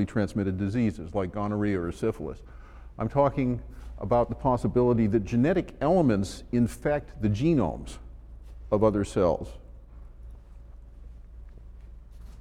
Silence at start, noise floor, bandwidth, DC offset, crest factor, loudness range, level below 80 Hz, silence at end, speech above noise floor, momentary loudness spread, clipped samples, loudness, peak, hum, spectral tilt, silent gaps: 0 s; -46 dBFS; 13 kHz; under 0.1%; 18 dB; 5 LU; -44 dBFS; 0 s; 20 dB; 18 LU; under 0.1%; -27 LUFS; -8 dBFS; none; -8 dB/octave; none